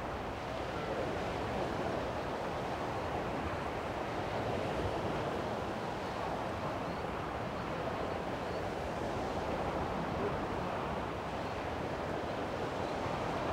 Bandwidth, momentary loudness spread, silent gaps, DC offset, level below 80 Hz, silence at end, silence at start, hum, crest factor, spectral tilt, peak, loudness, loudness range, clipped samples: 16 kHz; 3 LU; none; under 0.1%; -52 dBFS; 0 s; 0 s; none; 14 dB; -6 dB/octave; -24 dBFS; -37 LUFS; 1 LU; under 0.1%